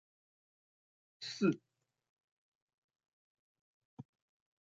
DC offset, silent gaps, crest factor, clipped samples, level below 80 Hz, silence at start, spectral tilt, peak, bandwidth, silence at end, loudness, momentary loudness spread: under 0.1%; 2.09-2.68 s, 2.74-2.89 s, 3.08-3.55 s, 3.61-3.97 s; 26 dB; under 0.1%; -88 dBFS; 1.2 s; -5.5 dB/octave; -20 dBFS; 7.6 kHz; 0.65 s; -38 LUFS; 23 LU